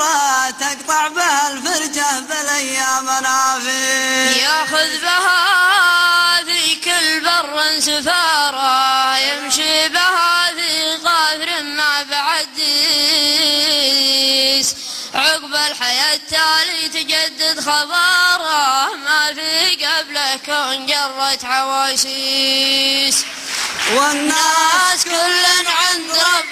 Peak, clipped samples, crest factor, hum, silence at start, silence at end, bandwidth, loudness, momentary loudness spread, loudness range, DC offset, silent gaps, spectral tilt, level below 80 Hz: -2 dBFS; under 0.1%; 14 dB; none; 0 s; 0 s; 15 kHz; -14 LUFS; 6 LU; 3 LU; under 0.1%; none; 1 dB/octave; -58 dBFS